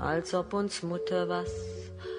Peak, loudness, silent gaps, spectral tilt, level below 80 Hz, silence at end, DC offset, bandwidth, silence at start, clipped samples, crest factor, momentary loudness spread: -16 dBFS; -33 LUFS; none; -5 dB/octave; -52 dBFS; 0 s; under 0.1%; 10.5 kHz; 0 s; under 0.1%; 16 dB; 9 LU